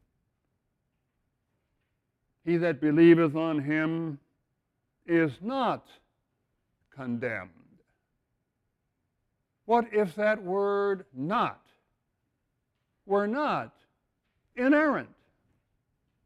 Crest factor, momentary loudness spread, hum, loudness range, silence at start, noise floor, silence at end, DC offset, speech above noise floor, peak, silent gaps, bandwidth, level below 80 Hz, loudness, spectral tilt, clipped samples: 22 dB; 15 LU; none; 10 LU; 2.45 s; -80 dBFS; 1.2 s; under 0.1%; 54 dB; -8 dBFS; none; 5.6 kHz; -72 dBFS; -27 LUFS; -8 dB/octave; under 0.1%